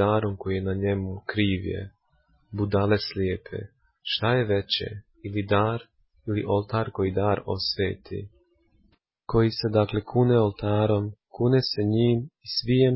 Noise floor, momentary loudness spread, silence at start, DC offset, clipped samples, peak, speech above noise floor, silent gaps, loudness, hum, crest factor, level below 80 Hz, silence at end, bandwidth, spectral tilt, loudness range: -65 dBFS; 14 LU; 0 s; under 0.1%; under 0.1%; -8 dBFS; 41 dB; none; -25 LUFS; none; 16 dB; -46 dBFS; 0 s; 5.8 kHz; -10 dB/octave; 4 LU